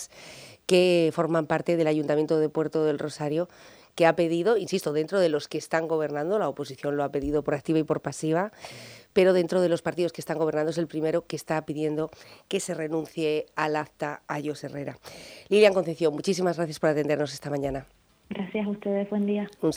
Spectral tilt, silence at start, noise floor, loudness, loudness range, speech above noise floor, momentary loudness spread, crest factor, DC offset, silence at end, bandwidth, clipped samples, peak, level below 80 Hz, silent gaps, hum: -5.5 dB/octave; 0 s; -47 dBFS; -26 LUFS; 4 LU; 21 dB; 13 LU; 20 dB; under 0.1%; 0 s; over 20 kHz; under 0.1%; -6 dBFS; -58 dBFS; none; none